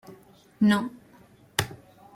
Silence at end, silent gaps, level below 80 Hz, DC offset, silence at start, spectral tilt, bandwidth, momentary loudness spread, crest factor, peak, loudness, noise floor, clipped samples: 0.4 s; none; -60 dBFS; under 0.1%; 0.1 s; -5 dB/octave; 16.5 kHz; 15 LU; 24 dB; -4 dBFS; -27 LUFS; -55 dBFS; under 0.1%